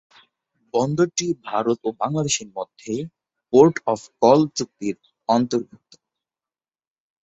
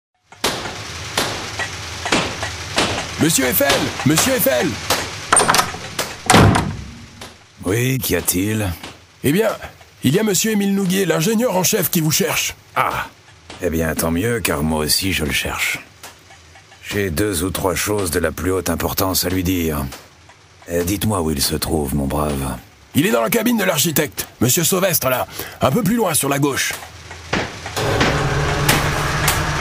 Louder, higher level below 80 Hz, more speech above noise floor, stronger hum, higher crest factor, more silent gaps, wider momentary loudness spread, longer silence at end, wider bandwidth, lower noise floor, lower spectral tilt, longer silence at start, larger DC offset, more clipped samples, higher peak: second, -21 LUFS vs -18 LUFS; second, -62 dBFS vs -36 dBFS; first, over 69 dB vs 28 dB; neither; about the same, 20 dB vs 18 dB; neither; first, 14 LU vs 11 LU; first, 1.6 s vs 0 s; second, 8.4 kHz vs 16.5 kHz; first, under -90 dBFS vs -46 dBFS; first, -5 dB/octave vs -3.5 dB/octave; first, 0.75 s vs 0.45 s; neither; neither; about the same, -2 dBFS vs 0 dBFS